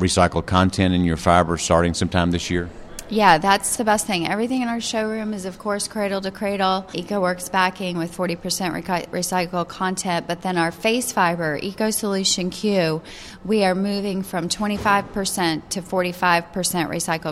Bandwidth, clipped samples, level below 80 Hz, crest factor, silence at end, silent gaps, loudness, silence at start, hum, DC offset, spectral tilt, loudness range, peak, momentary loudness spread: 15.5 kHz; under 0.1%; -44 dBFS; 22 dB; 0 s; none; -21 LUFS; 0 s; none; under 0.1%; -4 dB/octave; 4 LU; 0 dBFS; 8 LU